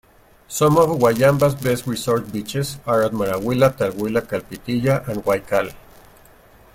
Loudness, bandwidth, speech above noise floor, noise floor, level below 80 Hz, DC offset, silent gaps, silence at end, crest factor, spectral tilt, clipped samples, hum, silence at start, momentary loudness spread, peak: -20 LUFS; 17 kHz; 30 dB; -49 dBFS; -48 dBFS; under 0.1%; none; 0.95 s; 18 dB; -6 dB/octave; under 0.1%; none; 0.5 s; 10 LU; -2 dBFS